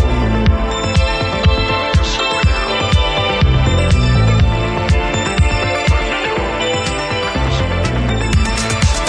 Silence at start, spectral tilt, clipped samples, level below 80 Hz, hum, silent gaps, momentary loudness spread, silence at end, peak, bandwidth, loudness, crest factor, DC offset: 0 s; -5 dB/octave; under 0.1%; -18 dBFS; none; none; 4 LU; 0 s; -2 dBFS; 10.5 kHz; -15 LUFS; 12 dB; under 0.1%